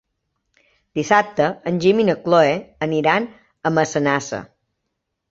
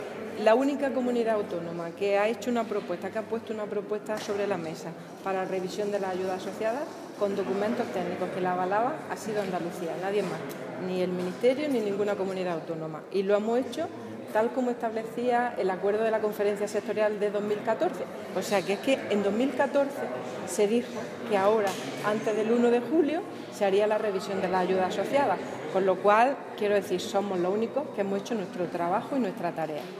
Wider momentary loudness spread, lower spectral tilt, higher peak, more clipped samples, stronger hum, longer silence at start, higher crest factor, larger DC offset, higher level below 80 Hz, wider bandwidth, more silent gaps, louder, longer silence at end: first, 12 LU vs 9 LU; about the same, -5.5 dB/octave vs -5.5 dB/octave; first, -2 dBFS vs -8 dBFS; neither; neither; first, 0.95 s vs 0 s; about the same, 18 dB vs 20 dB; neither; first, -60 dBFS vs -80 dBFS; second, 8 kHz vs 15.5 kHz; neither; first, -19 LUFS vs -28 LUFS; first, 0.85 s vs 0 s